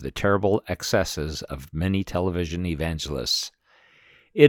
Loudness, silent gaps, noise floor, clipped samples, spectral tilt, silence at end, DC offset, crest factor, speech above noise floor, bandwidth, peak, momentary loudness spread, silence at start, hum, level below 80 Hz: -26 LUFS; none; -58 dBFS; under 0.1%; -5 dB/octave; 0 s; under 0.1%; 22 dB; 32 dB; 19 kHz; -2 dBFS; 10 LU; 0 s; none; -44 dBFS